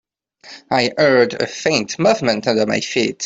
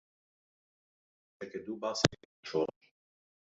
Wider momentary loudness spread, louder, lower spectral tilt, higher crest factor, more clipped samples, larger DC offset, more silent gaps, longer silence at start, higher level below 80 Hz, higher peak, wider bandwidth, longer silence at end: second, 5 LU vs 16 LU; first, -17 LUFS vs -35 LUFS; about the same, -4 dB/octave vs -3.5 dB/octave; second, 16 dB vs 38 dB; neither; neither; second, none vs 2.25-2.43 s; second, 0.45 s vs 1.4 s; first, -58 dBFS vs -66 dBFS; about the same, -2 dBFS vs 0 dBFS; about the same, 8 kHz vs 7.6 kHz; second, 0 s vs 0.95 s